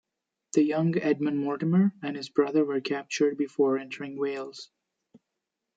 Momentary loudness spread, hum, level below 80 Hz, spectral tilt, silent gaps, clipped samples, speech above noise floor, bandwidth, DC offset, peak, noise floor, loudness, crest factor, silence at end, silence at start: 10 LU; none; -78 dBFS; -6.5 dB/octave; none; under 0.1%; 58 dB; 9 kHz; under 0.1%; -10 dBFS; -85 dBFS; -27 LUFS; 18 dB; 1.1 s; 0.55 s